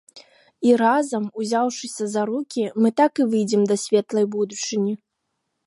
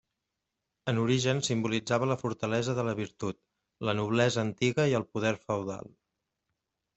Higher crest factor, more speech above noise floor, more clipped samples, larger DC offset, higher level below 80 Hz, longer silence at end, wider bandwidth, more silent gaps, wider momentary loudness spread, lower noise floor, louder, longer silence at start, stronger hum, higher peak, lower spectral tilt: about the same, 16 dB vs 20 dB; about the same, 56 dB vs 56 dB; neither; neither; second, -76 dBFS vs -66 dBFS; second, 0.7 s vs 1.1 s; first, 11.5 kHz vs 8.2 kHz; neither; second, 8 LU vs 11 LU; second, -77 dBFS vs -85 dBFS; first, -21 LUFS vs -30 LUFS; second, 0.15 s vs 0.85 s; neither; first, -4 dBFS vs -10 dBFS; about the same, -5 dB/octave vs -5.5 dB/octave